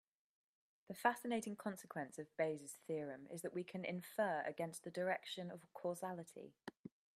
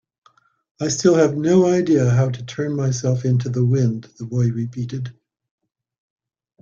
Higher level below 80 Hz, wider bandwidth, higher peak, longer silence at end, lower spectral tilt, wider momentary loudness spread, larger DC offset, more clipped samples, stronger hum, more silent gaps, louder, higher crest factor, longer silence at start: second, -90 dBFS vs -56 dBFS; first, 15.5 kHz vs 7.6 kHz; second, -20 dBFS vs -2 dBFS; second, 0.25 s vs 1.5 s; second, -4.5 dB/octave vs -6.5 dB/octave; first, 15 LU vs 12 LU; neither; neither; neither; first, 6.79-6.84 s vs none; second, -45 LUFS vs -19 LUFS; first, 26 dB vs 18 dB; about the same, 0.9 s vs 0.8 s